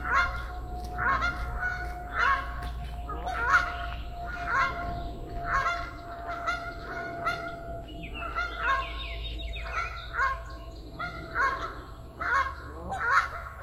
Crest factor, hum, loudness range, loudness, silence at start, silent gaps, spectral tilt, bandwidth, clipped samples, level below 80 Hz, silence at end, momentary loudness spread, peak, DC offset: 20 dB; none; 4 LU; -31 LUFS; 0 s; none; -4.5 dB/octave; 14 kHz; under 0.1%; -40 dBFS; 0 s; 13 LU; -10 dBFS; under 0.1%